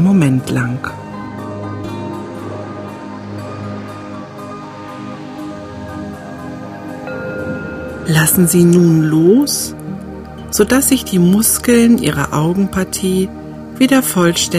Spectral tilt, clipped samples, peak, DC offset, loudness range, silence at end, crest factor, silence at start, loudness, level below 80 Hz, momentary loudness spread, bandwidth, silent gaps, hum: -5 dB/octave; under 0.1%; 0 dBFS; under 0.1%; 15 LU; 0 s; 16 dB; 0 s; -14 LUFS; -42 dBFS; 18 LU; 16 kHz; none; none